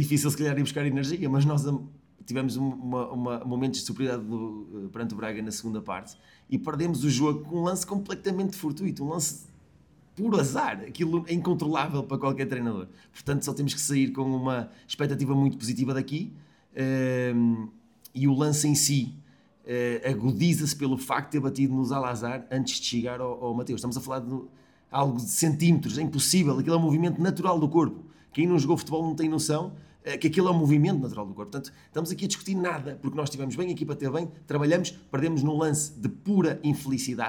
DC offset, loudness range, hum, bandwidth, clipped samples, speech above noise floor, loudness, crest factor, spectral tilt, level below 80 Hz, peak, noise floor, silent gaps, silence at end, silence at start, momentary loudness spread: under 0.1%; 6 LU; none; 19.5 kHz; under 0.1%; 31 dB; -27 LUFS; 18 dB; -5.5 dB/octave; -62 dBFS; -10 dBFS; -58 dBFS; none; 0 s; 0 s; 11 LU